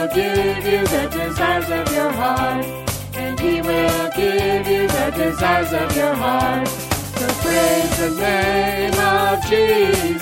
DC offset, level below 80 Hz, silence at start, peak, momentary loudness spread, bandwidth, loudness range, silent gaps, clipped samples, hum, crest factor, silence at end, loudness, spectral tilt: under 0.1%; -36 dBFS; 0 s; -4 dBFS; 6 LU; 17 kHz; 3 LU; none; under 0.1%; none; 14 dB; 0 s; -18 LUFS; -4.5 dB/octave